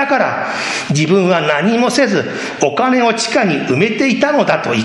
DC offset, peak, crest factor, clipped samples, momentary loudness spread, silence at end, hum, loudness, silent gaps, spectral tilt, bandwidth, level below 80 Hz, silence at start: under 0.1%; 0 dBFS; 14 dB; under 0.1%; 5 LU; 0 s; none; -14 LUFS; none; -4.5 dB/octave; 12 kHz; -56 dBFS; 0 s